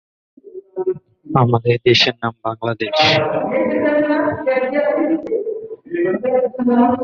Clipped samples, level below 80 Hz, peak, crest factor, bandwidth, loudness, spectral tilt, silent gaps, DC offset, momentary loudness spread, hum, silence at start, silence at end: under 0.1%; -54 dBFS; -2 dBFS; 16 dB; 7.2 kHz; -17 LUFS; -6 dB/octave; none; under 0.1%; 10 LU; none; 0.45 s; 0 s